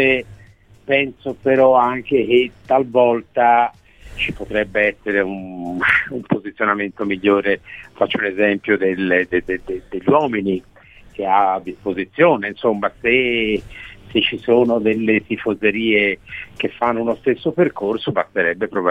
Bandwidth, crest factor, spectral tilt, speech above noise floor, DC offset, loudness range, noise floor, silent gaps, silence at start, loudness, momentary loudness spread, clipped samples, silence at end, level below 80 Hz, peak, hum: 9.4 kHz; 18 dB; -7 dB/octave; 29 dB; 0.1%; 3 LU; -47 dBFS; none; 0 s; -18 LUFS; 10 LU; under 0.1%; 0 s; -48 dBFS; -2 dBFS; none